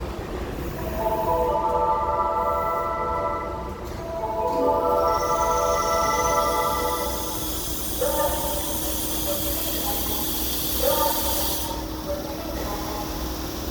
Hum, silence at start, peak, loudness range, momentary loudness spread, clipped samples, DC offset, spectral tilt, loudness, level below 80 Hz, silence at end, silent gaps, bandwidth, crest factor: none; 0 s; -8 dBFS; 2 LU; 9 LU; under 0.1%; under 0.1%; -3.5 dB/octave; -24 LUFS; -36 dBFS; 0 s; none; over 20 kHz; 16 dB